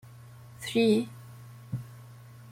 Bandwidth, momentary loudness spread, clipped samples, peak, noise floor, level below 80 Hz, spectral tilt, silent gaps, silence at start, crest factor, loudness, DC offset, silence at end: 16 kHz; 25 LU; under 0.1%; -14 dBFS; -49 dBFS; -66 dBFS; -6 dB/octave; none; 0.05 s; 18 dB; -29 LUFS; under 0.1%; 0 s